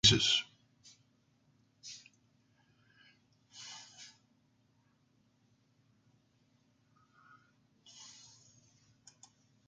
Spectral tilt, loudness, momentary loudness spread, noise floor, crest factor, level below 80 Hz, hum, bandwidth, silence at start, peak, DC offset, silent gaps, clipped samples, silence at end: -2.5 dB/octave; -30 LUFS; 29 LU; -73 dBFS; 30 dB; -64 dBFS; none; 9.6 kHz; 0.05 s; -10 dBFS; under 0.1%; none; under 0.1%; 5.65 s